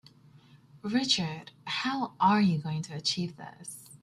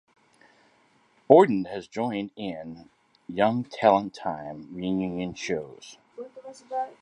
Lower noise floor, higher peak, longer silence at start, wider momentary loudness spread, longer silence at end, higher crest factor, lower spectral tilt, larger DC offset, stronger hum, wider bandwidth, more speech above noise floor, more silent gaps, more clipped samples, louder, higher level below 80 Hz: second, -57 dBFS vs -63 dBFS; second, -12 dBFS vs -2 dBFS; second, 0.55 s vs 1.3 s; second, 18 LU vs 24 LU; about the same, 0.05 s vs 0.1 s; second, 20 dB vs 26 dB; second, -4.5 dB/octave vs -6.5 dB/octave; neither; neither; first, 14 kHz vs 10.5 kHz; second, 28 dB vs 38 dB; neither; neither; second, -29 LUFS vs -25 LUFS; second, -70 dBFS vs -64 dBFS